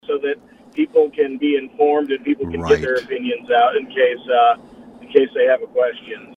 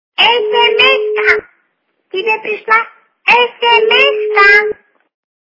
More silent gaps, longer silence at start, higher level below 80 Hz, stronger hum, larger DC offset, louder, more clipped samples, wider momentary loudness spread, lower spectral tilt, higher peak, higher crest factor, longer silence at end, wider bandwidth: neither; about the same, 0.1 s vs 0.2 s; about the same, -50 dBFS vs -52 dBFS; neither; neither; second, -18 LUFS vs -10 LUFS; second, under 0.1% vs 0.3%; second, 8 LU vs 11 LU; first, -6 dB/octave vs -2 dB/octave; about the same, 0 dBFS vs 0 dBFS; first, 18 dB vs 12 dB; second, 0.1 s vs 0.75 s; first, 7.4 kHz vs 6 kHz